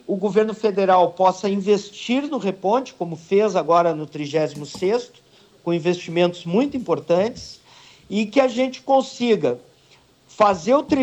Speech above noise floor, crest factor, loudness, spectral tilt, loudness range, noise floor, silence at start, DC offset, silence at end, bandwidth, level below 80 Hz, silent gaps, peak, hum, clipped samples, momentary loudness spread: 35 dB; 16 dB; -21 LUFS; -6 dB/octave; 3 LU; -54 dBFS; 0.1 s; under 0.1%; 0 s; 9 kHz; -60 dBFS; none; -6 dBFS; none; under 0.1%; 9 LU